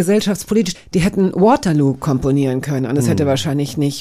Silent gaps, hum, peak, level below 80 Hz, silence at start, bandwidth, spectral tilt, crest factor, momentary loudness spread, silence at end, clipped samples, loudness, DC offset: none; none; -2 dBFS; -40 dBFS; 0 s; 15.5 kHz; -6 dB/octave; 12 dB; 6 LU; 0 s; under 0.1%; -16 LUFS; under 0.1%